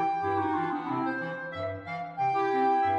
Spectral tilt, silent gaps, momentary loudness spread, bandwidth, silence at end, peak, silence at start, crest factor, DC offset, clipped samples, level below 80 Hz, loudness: -7.5 dB/octave; none; 10 LU; 7.4 kHz; 0 s; -16 dBFS; 0 s; 12 dB; under 0.1%; under 0.1%; -72 dBFS; -30 LUFS